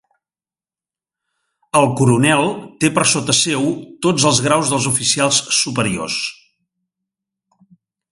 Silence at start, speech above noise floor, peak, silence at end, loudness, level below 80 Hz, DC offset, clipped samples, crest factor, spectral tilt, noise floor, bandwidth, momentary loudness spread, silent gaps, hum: 1.75 s; over 74 dB; 0 dBFS; 1.8 s; -16 LUFS; -54 dBFS; under 0.1%; under 0.1%; 18 dB; -3.5 dB/octave; under -90 dBFS; 11.5 kHz; 7 LU; none; none